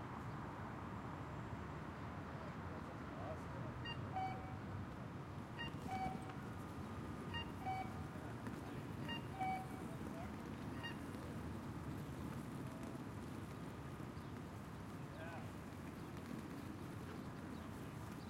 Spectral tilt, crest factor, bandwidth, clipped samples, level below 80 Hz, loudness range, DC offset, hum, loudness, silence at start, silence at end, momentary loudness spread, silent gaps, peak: -6.5 dB/octave; 16 dB; 16 kHz; under 0.1%; -64 dBFS; 4 LU; under 0.1%; none; -49 LUFS; 0 s; 0 s; 6 LU; none; -32 dBFS